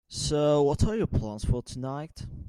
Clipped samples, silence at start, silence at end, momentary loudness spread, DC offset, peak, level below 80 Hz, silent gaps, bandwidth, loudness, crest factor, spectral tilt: under 0.1%; 0.1 s; 0 s; 12 LU; under 0.1%; -12 dBFS; -38 dBFS; none; 13 kHz; -28 LUFS; 16 dB; -6 dB/octave